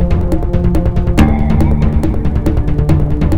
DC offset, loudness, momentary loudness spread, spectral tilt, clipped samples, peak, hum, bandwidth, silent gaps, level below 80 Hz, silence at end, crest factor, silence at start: 8%; -14 LUFS; 4 LU; -8.5 dB/octave; 0.2%; 0 dBFS; none; 15.5 kHz; none; -16 dBFS; 0 s; 12 dB; 0 s